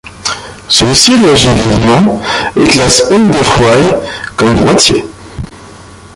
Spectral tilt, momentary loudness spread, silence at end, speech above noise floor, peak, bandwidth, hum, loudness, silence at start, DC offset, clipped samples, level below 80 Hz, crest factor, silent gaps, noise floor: -4 dB/octave; 15 LU; 0.2 s; 24 dB; 0 dBFS; 16 kHz; none; -8 LUFS; 0.05 s; under 0.1%; 0.2%; -30 dBFS; 8 dB; none; -32 dBFS